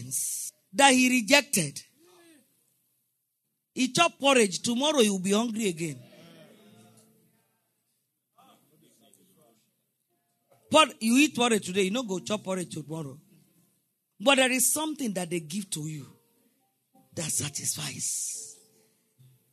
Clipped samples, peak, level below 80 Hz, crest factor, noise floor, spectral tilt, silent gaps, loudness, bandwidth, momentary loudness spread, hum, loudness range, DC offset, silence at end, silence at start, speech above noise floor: under 0.1%; -4 dBFS; -78 dBFS; 26 dB; -80 dBFS; -2.5 dB/octave; none; -25 LUFS; 13.5 kHz; 16 LU; none; 7 LU; under 0.1%; 1 s; 0 s; 54 dB